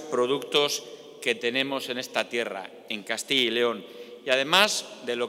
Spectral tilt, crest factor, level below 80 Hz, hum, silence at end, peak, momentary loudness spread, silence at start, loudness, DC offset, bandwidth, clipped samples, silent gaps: -2 dB/octave; 24 dB; -80 dBFS; none; 0 s; -2 dBFS; 15 LU; 0 s; -25 LUFS; under 0.1%; 16 kHz; under 0.1%; none